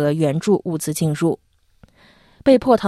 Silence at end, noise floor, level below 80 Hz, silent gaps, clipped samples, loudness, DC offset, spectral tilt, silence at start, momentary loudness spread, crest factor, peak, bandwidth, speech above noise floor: 0 s; -53 dBFS; -52 dBFS; none; under 0.1%; -19 LUFS; under 0.1%; -6.5 dB/octave; 0 s; 7 LU; 18 dB; -2 dBFS; 13.5 kHz; 36 dB